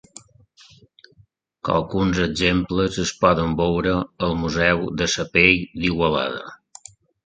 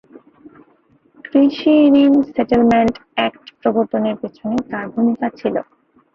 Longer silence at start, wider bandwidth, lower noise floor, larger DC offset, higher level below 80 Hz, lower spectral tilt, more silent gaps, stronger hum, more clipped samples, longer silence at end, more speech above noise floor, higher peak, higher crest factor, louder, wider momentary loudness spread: first, 1.65 s vs 1.35 s; first, 9.4 kHz vs 6.8 kHz; about the same, -58 dBFS vs -55 dBFS; neither; first, -40 dBFS vs -52 dBFS; second, -5 dB/octave vs -7.5 dB/octave; neither; neither; neither; first, 0.7 s vs 0.55 s; about the same, 37 dB vs 40 dB; about the same, 0 dBFS vs -2 dBFS; first, 22 dB vs 14 dB; second, -20 LUFS vs -16 LUFS; about the same, 9 LU vs 11 LU